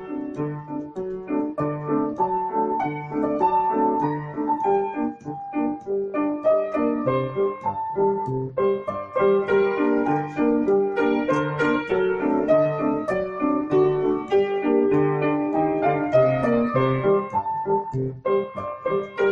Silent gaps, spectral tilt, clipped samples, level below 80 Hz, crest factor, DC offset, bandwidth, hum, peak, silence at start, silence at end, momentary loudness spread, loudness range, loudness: none; -8.5 dB/octave; under 0.1%; -56 dBFS; 16 dB; under 0.1%; 7 kHz; none; -8 dBFS; 0 s; 0 s; 8 LU; 3 LU; -23 LUFS